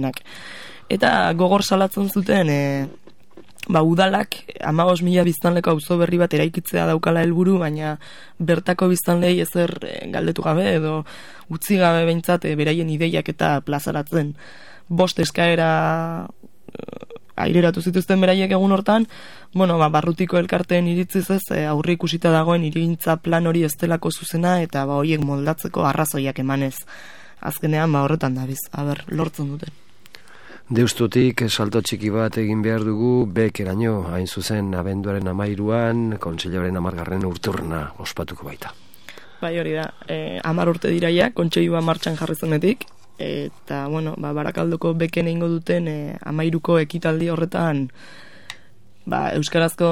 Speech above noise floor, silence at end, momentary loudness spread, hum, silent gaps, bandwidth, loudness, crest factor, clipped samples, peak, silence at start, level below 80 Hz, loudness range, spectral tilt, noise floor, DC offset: 33 dB; 0 s; 12 LU; none; none; 18 kHz; -20 LUFS; 18 dB; under 0.1%; -2 dBFS; 0 s; -52 dBFS; 5 LU; -6 dB/octave; -53 dBFS; 0.9%